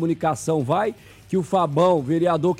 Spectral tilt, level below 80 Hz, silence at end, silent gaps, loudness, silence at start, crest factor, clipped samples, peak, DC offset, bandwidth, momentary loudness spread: -7 dB/octave; -58 dBFS; 0 s; none; -21 LUFS; 0 s; 14 dB; under 0.1%; -8 dBFS; under 0.1%; 14.5 kHz; 8 LU